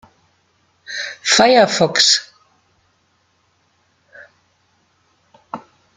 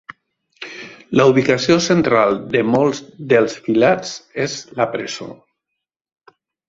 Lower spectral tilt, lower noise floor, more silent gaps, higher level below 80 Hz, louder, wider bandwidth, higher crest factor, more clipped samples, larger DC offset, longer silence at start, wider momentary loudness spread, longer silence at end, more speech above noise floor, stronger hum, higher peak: second, -2 dB/octave vs -5 dB/octave; second, -62 dBFS vs -80 dBFS; neither; second, -62 dBFS vs -56 dBFS; first, -13 LUFS vs -17 LUFS; first, 12 kHz vs 7.8 kHz; about the same, 20 dB vs 18 dB; neither; neither; first, 0.9 s vs 0.6 s; first, 23 LU vs 18 LU; second, 0.4 s vs 1.35 s; second, 49 dB vs 64 dB; neither; about the same, 0 dBFS vs 0 dBFS